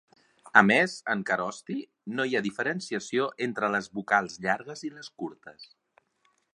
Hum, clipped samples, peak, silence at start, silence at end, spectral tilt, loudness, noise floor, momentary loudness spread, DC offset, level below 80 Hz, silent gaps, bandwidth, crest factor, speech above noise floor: none; under 0.1%; -2 dBFS; 0.45 s; 0.9 s; -4.5 dB/octave; -27 LUFS; -71 dBFS; 17 LU; under 0.1%; -72 dBFS; none; 11 kHz; 28 dB; 43 dB